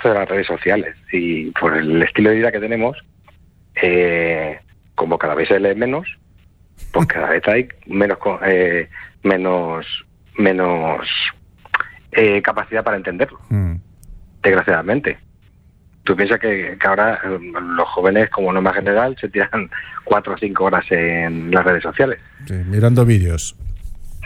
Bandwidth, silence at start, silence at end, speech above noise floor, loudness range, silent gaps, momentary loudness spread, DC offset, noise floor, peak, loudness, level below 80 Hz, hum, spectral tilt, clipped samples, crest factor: 14 kHz; 0 s; 0 s; 33 dB; 3 LU; none; 11 LU; under 0.1%; -49 dBFS; -2 dBFS; -17 LUFS; -40 dBFS; none; -6.5 dB/octave; under 0.1%; 16 dB